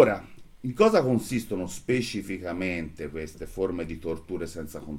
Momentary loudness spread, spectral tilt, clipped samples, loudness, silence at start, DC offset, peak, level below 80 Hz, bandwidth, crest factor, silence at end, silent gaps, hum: 15 LU; -6 dB/octave; under 0.1%; -28 LUFS; 0 s; under 0.1%; -4 dBFS; -50 dBFS; 17 kHz; 22 dB; 0 s; none; none